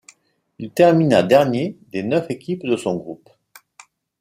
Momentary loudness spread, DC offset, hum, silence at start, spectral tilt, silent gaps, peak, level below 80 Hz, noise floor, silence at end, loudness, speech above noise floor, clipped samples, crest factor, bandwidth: 16 LU; under 0.1%; none; 0.6 s; -6.5 dB/octave; none; -2 dBFS; -62 dBFS; -56 dBFS; 1.05 s; -18 LUFS; 38 dB; under 0.1%; 18 dB; 15.5 kHz